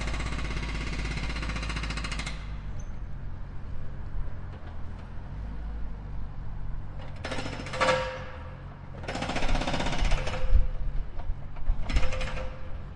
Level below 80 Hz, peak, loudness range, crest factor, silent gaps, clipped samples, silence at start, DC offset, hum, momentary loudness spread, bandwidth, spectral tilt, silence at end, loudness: -32 dBFS; -10 dBFS; 10 LU; 20 dB; none; under 0.1%; 0 s; under 0.1%; none; 12 LU; 10.5 kHz; -5 dB/octave; 0 s; -34 LUFS